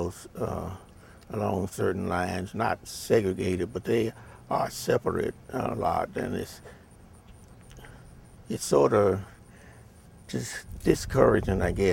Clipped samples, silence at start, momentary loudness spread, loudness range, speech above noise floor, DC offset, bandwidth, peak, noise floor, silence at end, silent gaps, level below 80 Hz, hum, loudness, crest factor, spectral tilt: under 0.1%; 0 s; 17 LU; 5 LU; 25 dB; under 0.1%; 17 kHz; -6 dBFS; -52 dBFS; 0 s; none; -46 dBFS; none; -28 LUFS; 22 dB; -6 dB/octave